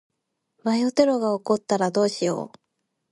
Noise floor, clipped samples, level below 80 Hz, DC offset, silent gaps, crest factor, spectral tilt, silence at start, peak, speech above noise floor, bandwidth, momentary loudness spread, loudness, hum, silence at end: -73 dBFS; under 0.1%; -70 dBFS; under 0.1%; none; 18 dB; -5 dB/octave; 0.65 s; -6 dBFS; 50 dB; 11.5 kHz; 10 LU; -23 LUFS; none; 0.65 s